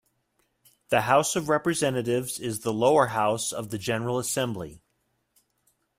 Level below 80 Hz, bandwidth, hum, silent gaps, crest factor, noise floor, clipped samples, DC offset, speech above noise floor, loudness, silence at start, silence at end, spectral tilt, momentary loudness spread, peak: -62 dBFS; 16 kHz; none; none; 20 dB; -74 dBFS; under 0.1%; under 0.1%; 49 dB; -25 LUFS; 0.9 s; 1.2 s; -4 dB/octave; 10 LU; -6 dBFS